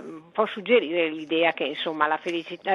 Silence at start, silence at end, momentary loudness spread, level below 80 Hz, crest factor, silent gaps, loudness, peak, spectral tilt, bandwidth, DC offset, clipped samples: 0 s; 0 s; 8 LU; -78 dBFS; 20 dB; none; -25 LUFS; -6 dBFS; -5 dB/octave; 7 kHz; under 0.1%; under 0.1%